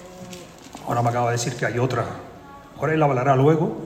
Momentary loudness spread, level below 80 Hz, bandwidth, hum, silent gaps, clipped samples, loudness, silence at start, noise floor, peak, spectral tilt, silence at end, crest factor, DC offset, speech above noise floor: 22 LU; -54 dBFS; 15 kHz; none; none; under 0.1%; -21 LUFS; 0 s; -42 dBFS; -4 dBFS; -6 dB/octave; 0 s; 18 dB; under 0.1%; 21 dB